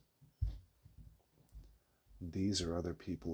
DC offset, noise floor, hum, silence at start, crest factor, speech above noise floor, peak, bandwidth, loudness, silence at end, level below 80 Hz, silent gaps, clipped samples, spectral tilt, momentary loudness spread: under 0.1%; -66 dBFS; none; 0.2 s; 20 dB; 27 dB; -24 dBFS; over 20 kHz; -41 LUFS; 0 s; -52 dBFS; none; under 0.1%; -5.5 dB/octave; 26 LU